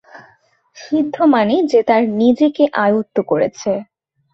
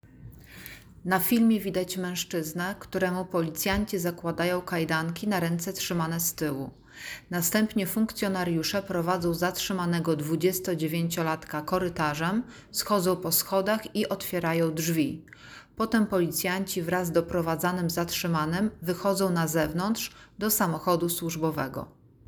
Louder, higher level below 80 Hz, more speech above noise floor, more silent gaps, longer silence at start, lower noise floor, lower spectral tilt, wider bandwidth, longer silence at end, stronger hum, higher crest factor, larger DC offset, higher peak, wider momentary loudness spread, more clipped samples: first, -15 LUFS vs -28 LUFS; second, -60 dBFS vs -54 dBFS; first, 40 dB vs 20 dB; neither; about the same, 0.15 s vs 0.05 s; first, -55 dBFS vs -48 dBFS; first, -6 dB/octave vs -4.5 dB/octave; second, 7.8 kHz vs over 20 kHz; about the same, 0.5 s vs 0.4 s; neither; about the same, 14 dB vs 18 dB; neither; first, -2 dBFS vs -10 dBFS; about the same, 8 LU vs 8 LU; neither